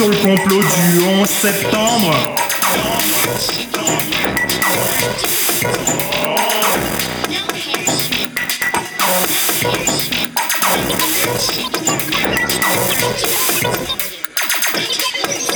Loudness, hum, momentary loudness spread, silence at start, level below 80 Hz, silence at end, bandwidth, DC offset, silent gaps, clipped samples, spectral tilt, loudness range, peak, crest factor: -14 LUFS; none; 5 LU; 0 s; -44 dBFS; 0 s; over 20 kHz; under 0.1%; none; under 0.1%; -2.5 dB/octave; 2 LU; 0 dBFS; 16 dB